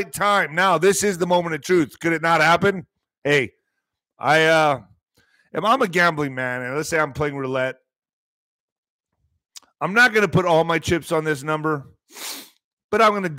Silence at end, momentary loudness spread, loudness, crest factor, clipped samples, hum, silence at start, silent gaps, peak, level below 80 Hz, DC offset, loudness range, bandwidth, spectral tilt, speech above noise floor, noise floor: 0 s; 14 LU; -19 LUFS; 16 dB; under 0.1%; none; 0 s; 3.18-3.22 s, 7.98-8.02 s, 8.13-8.83 s, 8.89-8.99 s, 12.64-12.77 s, 12.84-12.89 s; -4 dBFS; -54 dBFS; under 0.1%; 5 LU; 16 kHz; -4.5 dB/octave; 60 dB; -79 dBFS